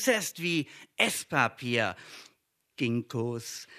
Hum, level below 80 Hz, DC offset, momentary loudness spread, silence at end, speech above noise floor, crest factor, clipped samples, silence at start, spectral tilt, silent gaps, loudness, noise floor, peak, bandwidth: none; -76 dBFS; under 0.1%; 17 LU; 0 s; 41 dB; 24 dB; under 0.1%; 0 s; -3.5 dB/octave; none; -30 LUFS; -72 dBFS; -8 dBFS; 14 kHz